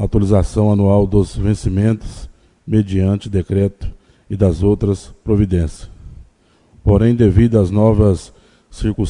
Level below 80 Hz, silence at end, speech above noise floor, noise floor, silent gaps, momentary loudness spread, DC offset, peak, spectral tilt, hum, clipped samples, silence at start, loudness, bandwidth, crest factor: -28 dBFS; 0 s; 38 dB; -52 dBFS; none; 11 LU; under 0.1%; 0 dBFS; -8.5 dB/octave; none; under 0.1%; 0 s; -16 LUFS; 10.5 kHz; 16 dB